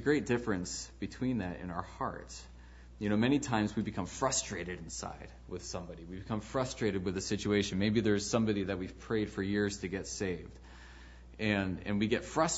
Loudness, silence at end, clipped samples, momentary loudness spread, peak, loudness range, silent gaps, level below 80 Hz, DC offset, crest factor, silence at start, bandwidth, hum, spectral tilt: -34 LUFS; 0 s; under 0.1%; 15 LU; -14 dBFS; 4 LU; none; -54 dBFS; under 0.1%; 20 dB; 0 s; 8 kHz; none; -4.5 dB/octave